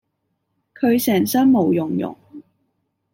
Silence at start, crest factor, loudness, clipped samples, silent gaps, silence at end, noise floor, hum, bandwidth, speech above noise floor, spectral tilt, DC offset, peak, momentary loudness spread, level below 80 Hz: 0.8 s; 14 dB; -18 LUFS; under 0.1%; none; 0.7 s; -73 dBFS; none; 16.5 kHz; 56 dB; -5.5 dB/octave; under 0.1%; -6 dBFS; 10 LU; -66 dBFS